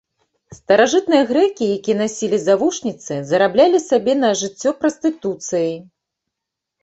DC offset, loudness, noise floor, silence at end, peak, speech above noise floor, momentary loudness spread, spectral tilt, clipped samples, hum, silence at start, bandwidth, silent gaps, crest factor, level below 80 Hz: under 0.1%; -17 LUFS; -82 dBFS; 1 s; 0 dBFS; 65 dB; 10 LU; -4 dB/octave; under 0.1%; none; 0.5 s; 8.2 kHz; none; 18 dB; -60 dBFS